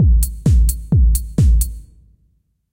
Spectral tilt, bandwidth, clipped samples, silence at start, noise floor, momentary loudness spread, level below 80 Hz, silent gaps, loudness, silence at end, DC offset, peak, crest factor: -7 dB/octave; 16.5 kHz; under 0.1%; 0 s; -61 dBFS; 6 LU; -16 dBFS; none; -16 LUFS; 0.9 s; under 0.1%; -4 dBFS; 12 dB